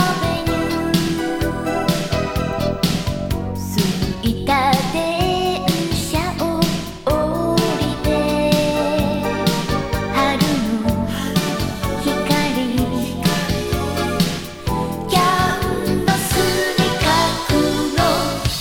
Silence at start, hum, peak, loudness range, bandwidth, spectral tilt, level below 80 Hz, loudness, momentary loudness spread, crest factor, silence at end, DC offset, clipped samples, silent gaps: 0 s; none; -2 dBFS; 3 LU; 18.5 kHz; -5 dB/octave; -32 dBFS; -19 LUFS; 5 LU; 16 dB; 0 s; under 0.1%; under 0.1%; none